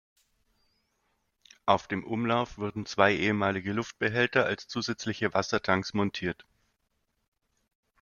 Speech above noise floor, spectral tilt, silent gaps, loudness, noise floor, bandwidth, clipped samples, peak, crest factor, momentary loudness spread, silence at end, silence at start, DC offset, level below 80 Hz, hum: 49 dB; -5 dB/octave; none; -29 LUFS; -77 dBFS; 7.2 kHz; under 0.1%; -6 dBFS; 26 dB; 9 LU; 1.7 s; 1.65 s; under 0.1%; -62 dBFS; none